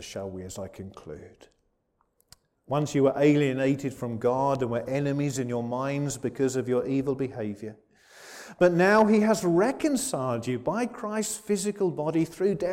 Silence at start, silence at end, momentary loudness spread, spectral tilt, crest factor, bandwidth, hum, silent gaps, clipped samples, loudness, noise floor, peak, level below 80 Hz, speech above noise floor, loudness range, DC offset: 0 s; 0 s; 17 LU; -6 dB/octave; 16 dB; 16.5 kHz; none; none; under 0.1%; -26 LUFS; -73 dBFS; -10 dBFS; -60 dBFS; 47 dB; 5 LU; under 0.1%